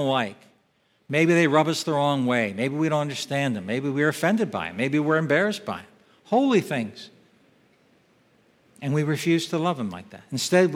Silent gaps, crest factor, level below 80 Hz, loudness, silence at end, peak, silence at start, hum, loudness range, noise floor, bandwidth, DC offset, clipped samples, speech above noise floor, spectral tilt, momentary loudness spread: none; 20 dB; -72 dBFS; -24 LUFS; 0 s; -4 dBFS; 0 s; none; 6 LU; -66 dBFS; 16.5 kHz; under 0.1%; under 0.1%; 43 dB; -5.5 dB/octave; 12 LU